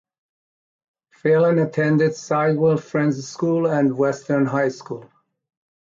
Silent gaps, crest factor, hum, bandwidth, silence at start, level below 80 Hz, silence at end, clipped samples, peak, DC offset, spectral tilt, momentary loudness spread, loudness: none; 14 dB; none; 7.6 kHz; 1.25 s; -66 dBFS; 0.85 s; under 0.1%; -8 dBFS; under 0.1%; -7.5 dB/octave; 7 LU; -20 LUFS